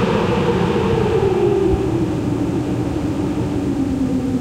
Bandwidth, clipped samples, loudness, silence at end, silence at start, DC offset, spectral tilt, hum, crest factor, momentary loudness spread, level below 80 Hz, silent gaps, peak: 15.5 kHz; under 0.1%; -18 LUFS; 0 s; 0 s; under 0.1%; -7.5 dB/octave; none; 12 dB; 5 LU; -34 dBFS; none; -6 dBFS